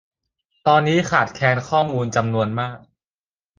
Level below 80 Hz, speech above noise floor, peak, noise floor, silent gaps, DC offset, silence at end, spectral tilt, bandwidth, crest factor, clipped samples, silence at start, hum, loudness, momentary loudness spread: -54 dBFS; over 71 dB; -2 dBFS; under -90 dBFS; none; under 0.1%; 0.8 s; -5.5 dB/octave; 9.6 kHz; 18 dB; under 0.1%; 0.65 s; none; -19 LUFS; 7 LU